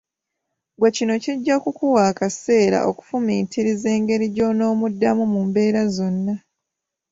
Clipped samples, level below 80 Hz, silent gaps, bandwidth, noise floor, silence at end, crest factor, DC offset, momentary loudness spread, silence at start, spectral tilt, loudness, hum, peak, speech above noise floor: under 0.1%; -60 dBFS; none; 7.8 kHz; -83 dBFS; 0.75 s; 16 dB; under 0.1%; 5 LU; 0.8 s; -6 dB/octave; -20 LUFS; none; -4 dBFS; 64 dB